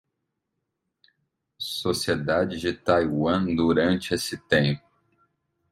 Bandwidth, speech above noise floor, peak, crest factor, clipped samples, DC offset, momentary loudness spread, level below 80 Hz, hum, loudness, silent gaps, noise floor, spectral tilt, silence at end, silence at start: 16 kHz; 57 dB; -6 dBFS; 20 dB; under 0.1%; under 0.1%; 7 LU; -56 dBFS; none; -24 LUFS; none; -80 dBFS; -5.5 dB/octave; 0.95 s; 1.6 s